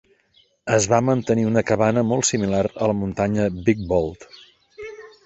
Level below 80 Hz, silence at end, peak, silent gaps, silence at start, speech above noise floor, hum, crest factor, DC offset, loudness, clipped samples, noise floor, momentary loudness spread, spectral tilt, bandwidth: -46 dBFS; 0.15 s; -2 dBFS; none; 0.65 s; 40 dB; none; 18 dB; under 0.1%; -20 LUFS; under 0.1%; -60 dBFS; 16 LU; -5.5 dB/octave; 8.4 kHz